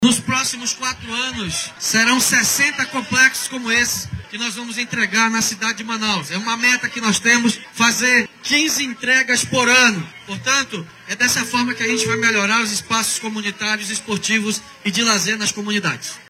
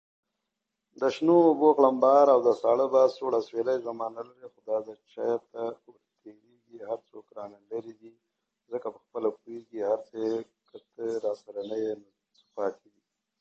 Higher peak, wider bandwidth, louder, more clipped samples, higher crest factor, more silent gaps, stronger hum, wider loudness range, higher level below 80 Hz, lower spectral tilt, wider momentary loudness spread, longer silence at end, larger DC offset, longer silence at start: first, -2 dBFS vs -8 dBFS; first, 18 kHz vs 7.6 kHz; first, -17 LUFS vs -27 LUFS; neither; about the same, 18 dB vs 20 dB; neither; neither; second, 3 LU vs 15 LU; first, -54 dBFS vs -80 dBFS; second, -1.5 dB/octave vs -7 dB/octave; second, 9 LU vs 22 LU; second, 0.1 s vs 0.65 s; neither; second, 0 s vs 1 s